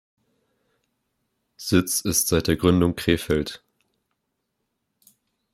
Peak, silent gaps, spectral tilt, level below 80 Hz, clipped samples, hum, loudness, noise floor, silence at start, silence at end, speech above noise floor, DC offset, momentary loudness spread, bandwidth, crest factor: -4 dBFS; none; -4.5 dB/octave; -48 dBFS; under 0.1%; none; -21 LUFS; -78 dBFS; 1.6 s; 1.95 s; 56 dB; under 0.1%; 12 LU; 16 kHz; 22 dB